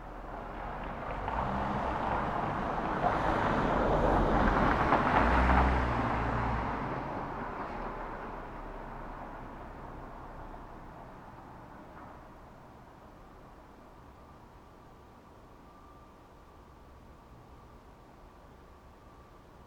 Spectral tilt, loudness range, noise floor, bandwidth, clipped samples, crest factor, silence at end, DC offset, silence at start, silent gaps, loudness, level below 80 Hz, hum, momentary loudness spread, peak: -7.5 dB/octave; 24 LU; -55 dBFS; 9.8 kHz; under 0.1%; 24 dB; 0 s; under 0.1%; 0 s; none; -31 LUFS; -42 dBFS; none; 27 LU; -10 dBFS